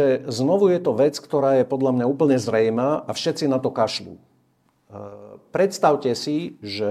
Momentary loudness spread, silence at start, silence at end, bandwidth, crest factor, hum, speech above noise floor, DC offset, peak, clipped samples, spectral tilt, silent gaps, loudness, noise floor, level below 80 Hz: 11 LU; 0 s; 0 s; 14.5 kHz; 16 dB; none; 43 dB; under 0.1%; -4 dBFS; under 0.1%; -6 dB/octave; none; -21 LUFS; -64 dBFS; -68 dBFS